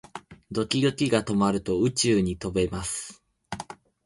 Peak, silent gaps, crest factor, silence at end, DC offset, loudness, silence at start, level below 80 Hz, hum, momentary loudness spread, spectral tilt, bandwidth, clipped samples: -6 dBFS; none; 20 dB; 0.3 s; under 0.1%; -25 LUFS; 0.15 s; -48 dBFS; none; 18 LU; -5 dB/octave; 11.5 kHz; under 0.1%